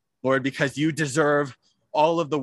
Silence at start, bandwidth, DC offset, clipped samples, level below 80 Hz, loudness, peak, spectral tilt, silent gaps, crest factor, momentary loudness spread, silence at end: 0.25 s; 12.5 kHz; under 0.1%; under 0.1%; -66 dBFS; -23 LUFS; -6 dBFS; -5 dB/octave; none; 18 dB; 5 LU; 0 s